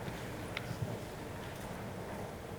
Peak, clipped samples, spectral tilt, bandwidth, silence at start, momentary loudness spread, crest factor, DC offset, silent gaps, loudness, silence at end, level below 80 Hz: -20 dBFS; under 0.1%; -5.5 dB/octave; over 20 kHz; 0 s; 3 LU; 22 dB; under 0.1%; none; -43 LUFS; 0 s; -56 dBFS